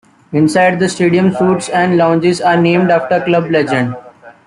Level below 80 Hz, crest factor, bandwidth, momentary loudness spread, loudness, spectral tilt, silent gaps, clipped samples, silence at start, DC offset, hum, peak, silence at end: -54 dBFS; 12 dB; 11.5 kHz; 5 LU; -12 LUFS; -6 dB/octave; none; under 0.1%; 0.3 s; under 0.1%; none; -2 dBFS; 0.15 s